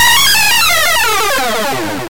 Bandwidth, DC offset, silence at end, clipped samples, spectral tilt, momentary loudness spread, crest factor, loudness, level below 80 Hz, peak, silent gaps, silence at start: 17 kHz; 8%; 0 s; under 0.1%; -0.5 dB/octave; 9 LU; 10 dB; -10 LUFS; -38 dBFS; -2 dBFS; none; 0 s